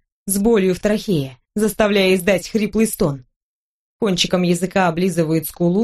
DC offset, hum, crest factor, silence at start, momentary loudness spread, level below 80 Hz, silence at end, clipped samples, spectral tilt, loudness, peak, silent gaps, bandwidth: under 0.1%; none; 18 dB; 0.25 s; 7 LU; -44 dBFS; 0 s; under 0.1%; -5 dB/octave; -18 LUFS; 0 dBFS; 3.36-3.99 s; 13 kHz